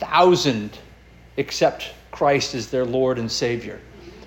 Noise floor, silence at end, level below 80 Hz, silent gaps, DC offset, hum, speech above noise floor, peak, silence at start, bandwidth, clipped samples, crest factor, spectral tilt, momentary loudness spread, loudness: -47 dBFS; 0 s; -50 dBFS; none; under 0.1%; none; 27 dB; -4 dBFS; 0 s; 17 kHz; under 0.1%; 18 dB; -4.5 dB/octave; 18 LU; -21 LUFS